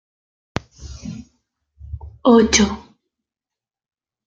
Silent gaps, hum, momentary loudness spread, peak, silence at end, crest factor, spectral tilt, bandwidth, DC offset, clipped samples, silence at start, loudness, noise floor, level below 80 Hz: none; none; 25 LU; -2 dBFS; 1.45 s; 20 dB; -4 dB/octave; 9.4 kHz; under 0.1%; under 0.1%; 0.8 s; -15 LUFS; -89 dBFS; -42 dBFS